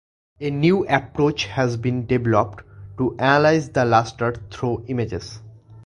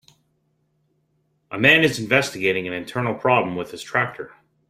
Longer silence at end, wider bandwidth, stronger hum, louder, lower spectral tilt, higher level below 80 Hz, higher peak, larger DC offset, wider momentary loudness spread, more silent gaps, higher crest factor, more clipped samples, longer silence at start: second, 0.05 s vs 0.45 s; second, 11 kHz vs 16 kHz; neither; about the same, -21 LUFS vs -20 LUFS; first, -6.5 dB/octave vs -4.5 dB/octave; first, -46 dBFS vs -60 dBFS; about the same, 0 dBFS vs -2 dBFS; neither; second, 13 LU vs 16 LU; neither; about the same, 20 dB vs 22 dB; neither; second, 0.4 s vs 1.5 s